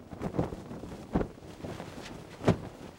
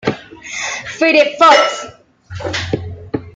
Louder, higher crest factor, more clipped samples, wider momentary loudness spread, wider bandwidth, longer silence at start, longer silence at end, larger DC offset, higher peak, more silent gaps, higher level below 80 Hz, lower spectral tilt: second, -36 LUFS vs -13 LUFS; first, 24 dB vs 16 dB; neither; second, 13 LU vs 19 LU; first, 16.5 kHz vs 9.2 kHz; about the same, 0 s vs 0.05 s; about the same, 0 s vs 0.05 s; neither; second, -12 dBFS vs 0 dBFS; neither; about the same, -50 dBFS vs -50 dBFS; first, -7 dB/octave vs -3.5 dB/octave